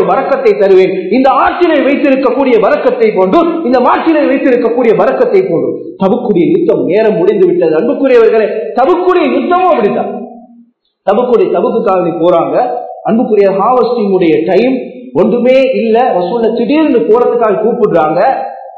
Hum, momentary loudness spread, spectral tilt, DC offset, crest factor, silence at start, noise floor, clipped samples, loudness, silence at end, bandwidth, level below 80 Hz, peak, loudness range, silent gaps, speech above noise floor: none; 5 LU; -8.5 dB/octave; under 0.1%; 8 dB; 0 s; -45 dBFS; 0.9%; -9 LUFS; 0 s; 6.6 kHz; -50 dBFS; 0 dBFS; 2 LU; none; 36 dB